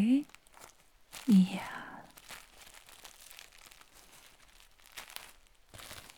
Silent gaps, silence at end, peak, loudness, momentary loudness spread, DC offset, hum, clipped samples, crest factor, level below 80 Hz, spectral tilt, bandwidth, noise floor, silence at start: none; 0.15 s; -16 dBFS; -31 LUFS; 28 LU; under 0.1%; none; under 0.1%; 20 dB; -66 dBFS; -6 dB/octave; 19 kHz; -60 dBFS; 0 s